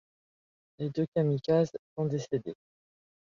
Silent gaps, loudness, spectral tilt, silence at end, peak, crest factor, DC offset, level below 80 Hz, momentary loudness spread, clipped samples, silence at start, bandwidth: 1.08-1.12 s, 1.79-1.96 s; -31 LUFS; -8 dB/octave; 0.7 s; -14 dBFS; 18 dB; under 0.1%; -68 dBFS; 11 LU; under 0.1%; 0.8 s; 7.4 kHz